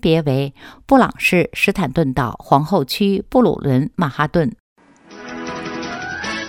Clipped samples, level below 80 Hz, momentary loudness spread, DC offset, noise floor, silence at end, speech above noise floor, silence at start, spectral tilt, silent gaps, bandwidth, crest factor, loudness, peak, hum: under 0.1%; -42 dBFS; 12 LU; under 0.1%; -40 dBFS; 0 s; 23 dB; 0.05 s; -6.5 dB/octave; 4.60-4.76 s; 17 kHz; 18 dB; -18 LUFS; 0 dBFS; none